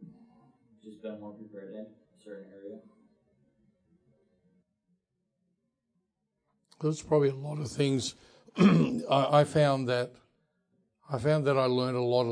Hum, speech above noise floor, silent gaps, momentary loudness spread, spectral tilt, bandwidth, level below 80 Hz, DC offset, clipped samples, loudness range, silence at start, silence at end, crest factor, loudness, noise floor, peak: none; 53 dB; none; 23 LU; -6.5 dB/octave; 10.5 kHz; -68 dBFS; under 0.1%; under 0.1%; 21 LU; 0 s; 0 s; 20 dB; -28 LUFS; -81 dBFS; -10 dBFS